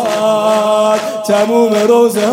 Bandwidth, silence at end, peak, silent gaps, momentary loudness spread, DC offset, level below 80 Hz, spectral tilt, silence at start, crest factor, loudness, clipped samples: 16.5 kHz; 0 s; 0 dBFS; none; 4 LU; under 0.1%; -72 dBFS; -4.5 dB/octave; 0 s; 10 dB; -11 LUFS; under 0.1%